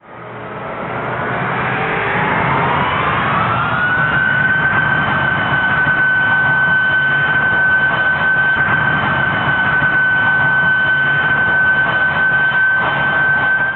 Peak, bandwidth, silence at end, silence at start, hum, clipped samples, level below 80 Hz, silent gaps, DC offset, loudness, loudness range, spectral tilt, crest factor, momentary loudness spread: -4 dBFS; 4.3 kHz; 0 s; 0.1 s; none; under 0.1%; -44 dBFS; none; under 0.1%; -13 LUFS; 3 LU; -9.5 dB/octave; 12 dB; 6 LU